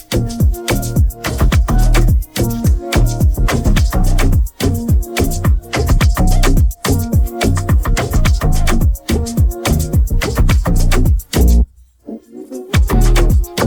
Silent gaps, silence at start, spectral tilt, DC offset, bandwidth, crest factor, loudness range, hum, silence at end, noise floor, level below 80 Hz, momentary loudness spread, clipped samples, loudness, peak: none; 0.1 s; -5.5 dB/octave; under 0.1%; over 20 kHz; 10 dB; 1 LU; none; 0 s; -33 dBFS; -14 dBFS; 4 LU; under 0.1%; -15 LUFS; -2 dBFS